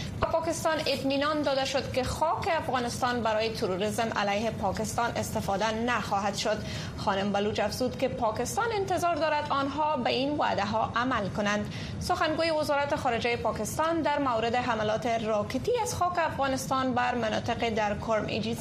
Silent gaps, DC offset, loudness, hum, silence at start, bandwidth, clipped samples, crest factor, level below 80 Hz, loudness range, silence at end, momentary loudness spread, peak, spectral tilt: none; under 0.1%; -28 LUFS; none; 0 s; 15 kHz; under 0.1%; 16 dB; -50 dBFS; 1 LU; 0 s; 3 LU; -12 dBFS; -4.5 dB/octave